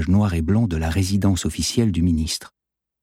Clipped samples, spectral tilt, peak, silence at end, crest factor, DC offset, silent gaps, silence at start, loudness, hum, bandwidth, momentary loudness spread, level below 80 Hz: under 0.1%; -5.5 dB/octave; -6 dBFS; 0.55 s; 14 dB; under 0.1%; none; 0 s; -21 LUFS; none; 16 kHz; 4 LU; -34 dBFS